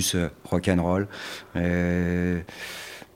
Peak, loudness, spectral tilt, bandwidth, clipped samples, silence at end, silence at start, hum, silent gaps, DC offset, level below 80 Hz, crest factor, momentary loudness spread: -6 dBFS; -26 LUFS; -5 dB/octave; 16 kHz; under 0.1%; 0.1 s; 0 s; none; none; under 0.1%; -46 dBFS; 20 dB; 12 LU